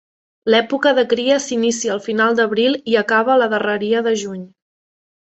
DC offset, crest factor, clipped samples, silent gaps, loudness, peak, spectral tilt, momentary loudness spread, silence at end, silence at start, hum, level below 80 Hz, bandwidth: under 0.1%; 16 dB; under 0.1%; none; -17 LUFS; -2 dBFS; -3.5 dB/octave; 6 LU; 0.95 s; 0.45 s; none; -64 dBFS; 8.2 kHz